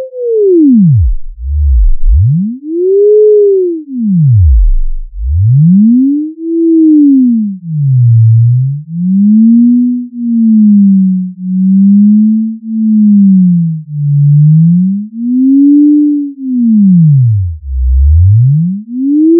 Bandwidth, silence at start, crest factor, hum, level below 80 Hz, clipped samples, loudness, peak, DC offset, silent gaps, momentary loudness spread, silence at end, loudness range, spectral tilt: 0.6 kHz; 0 s; 6 dB; none; -16 dBFS; under 0.1%; -8 LUFS; 0 dBFS; under 0.1%; none; 10 LU; 0 s; 2 LU; -22.5 dB/octave